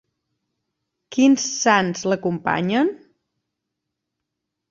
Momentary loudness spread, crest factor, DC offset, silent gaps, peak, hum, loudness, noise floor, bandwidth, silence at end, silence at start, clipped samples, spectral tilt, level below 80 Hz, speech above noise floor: 6 LU; 22 dB; under 0.1%; none; -2 dBFS; none; -20 LUFS; -81 dBFS; 7.6 kHz; 1.75 s; 1.1 s; under 0.1%; -4 dB/octave; -64 dBFS; 62 dB